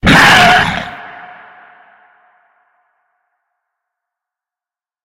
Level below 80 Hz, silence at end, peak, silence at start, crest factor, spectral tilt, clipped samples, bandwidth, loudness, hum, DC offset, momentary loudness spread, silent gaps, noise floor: -34 dBFS; 3.95 s; 0 dBFS; 0.05 s; 16 dB; -3.5 dB/octave; 0.1%; 17.5 kHz; -7 LUFS; none; under 0.1%; 27 LU; none; under -90 dBFS